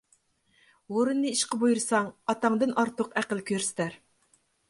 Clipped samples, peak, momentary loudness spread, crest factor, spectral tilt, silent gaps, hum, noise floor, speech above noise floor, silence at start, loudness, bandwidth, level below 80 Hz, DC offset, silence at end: under 0.1%; -10 dBFS; 6 LU; 18 dB; -3.5 dB/octave; none; none; -68 dBFS; 41 dB; 0.9 s; -28 LUFS; 11.5 kHz; -74 dBFS; under 0.1%; 0.75 s